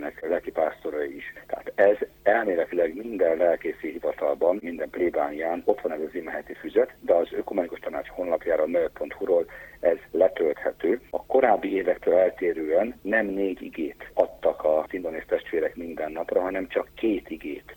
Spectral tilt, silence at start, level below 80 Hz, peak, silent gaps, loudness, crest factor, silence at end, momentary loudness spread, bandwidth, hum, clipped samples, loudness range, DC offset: -6.5 dB/octave; 0 s; -56 dBFS; -6 dBFS; none; -26 LUFS; 20 dB; 0 s; 10 LU; 17 kHz; none; under 0.1%; 3 LU; under 0.1%